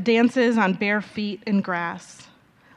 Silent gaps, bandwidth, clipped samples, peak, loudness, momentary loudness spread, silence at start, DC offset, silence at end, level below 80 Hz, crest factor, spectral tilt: none; 10.5 kHz; under 0.1%; -6 dBFS; -22 LUFS; 11 LU; 0 s; under 0.1%; 0.55 s; -68 dBFS; 18 dB; -6 dB/octave